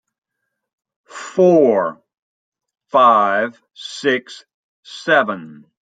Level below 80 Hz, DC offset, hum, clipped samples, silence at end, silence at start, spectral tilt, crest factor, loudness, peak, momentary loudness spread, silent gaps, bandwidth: -72 dBFS; under 0.1%; none; under 0.1%; 0.35 s; 1.15 s; -5.5 dB/octave; 16 dB; -16 LUFS; -2 dBFS; 19 LU; 2.19-2.52 s, 4.54-4.83 s; 9.2 kHz